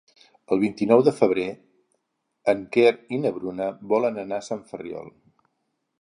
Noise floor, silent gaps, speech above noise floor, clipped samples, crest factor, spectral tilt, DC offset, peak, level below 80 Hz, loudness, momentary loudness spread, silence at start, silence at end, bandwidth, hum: -76 dBFS; none; 54 dB; under 0.1%; 22 dB; -6.5 dB/octave; under 0.1%; -2 dBFS; -66 dBFS; -23 LUFS; 15 LU; 0.5 s; 0.9 s; 10.5 kHz; none